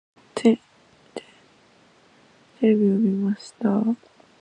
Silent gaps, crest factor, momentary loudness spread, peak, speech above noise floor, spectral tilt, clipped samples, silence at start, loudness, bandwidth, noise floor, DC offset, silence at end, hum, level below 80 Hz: none; 20 dB; 21 LU; -6 dBFS; 35 dB; -7.5 dB/octave; under 0.1%; 0.35 s; -22 LUFS; 10 kHz; -56 dBFS; under 0.1%; 0.45 s; none; -72 dBFS